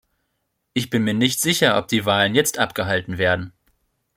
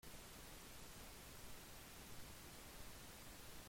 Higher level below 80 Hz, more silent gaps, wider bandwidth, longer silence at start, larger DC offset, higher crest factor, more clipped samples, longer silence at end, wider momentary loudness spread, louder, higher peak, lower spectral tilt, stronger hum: first, -56 dBFS vs -64 dBFS; neither; about the same, 16.5 kHz vs 16.5 kHz; first, 0.75 s vs 0.05 s; neither; first, 20 dB vs 14 dB; neither; first, 0.65 s vs 0 s; first, 8 LU vs 0 LU; first, -20 LUFS vs -57 LUFS; first, -2 dBFS vs -42 dBFS; about the same, -3.5 dB/octave vs -3 dB/octave; neither